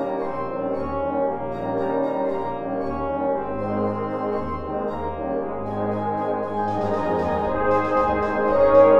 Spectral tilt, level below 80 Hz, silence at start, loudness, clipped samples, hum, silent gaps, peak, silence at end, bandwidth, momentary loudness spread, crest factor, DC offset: -8.5 dB/octave; -44 dBFS; 0 s; -24 LUFS; under 0.1%; none; none; -4 dBFS; 0 s; 6.6 kHz; 7 LU; 18 dB; 0.9%